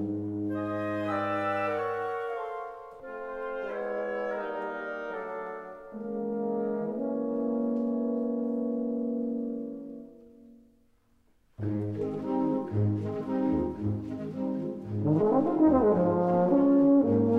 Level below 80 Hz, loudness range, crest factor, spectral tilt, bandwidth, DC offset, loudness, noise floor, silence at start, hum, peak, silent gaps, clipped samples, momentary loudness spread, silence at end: -58 dBFS; 9 LU; 18 dB; -10 dB/octave; 5.6 kHz; under 0.1%; -29 LUFS; -65 dBFS; 0 s; none; -10 dBFS; none; under 0.1%; 14 LU; 0 s